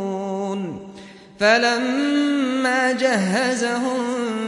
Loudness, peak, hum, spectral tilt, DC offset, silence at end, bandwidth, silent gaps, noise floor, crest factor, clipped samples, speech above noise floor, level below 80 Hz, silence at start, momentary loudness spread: -20 LUFS; -4 dBFS; none; -4 dB/octave; under 0.1%; 0 s; 11.5 kHz; none; -42 dBFS; 18 dB; under 0.1%; 23 dB; -64 dBFS; 0 s; 10 LU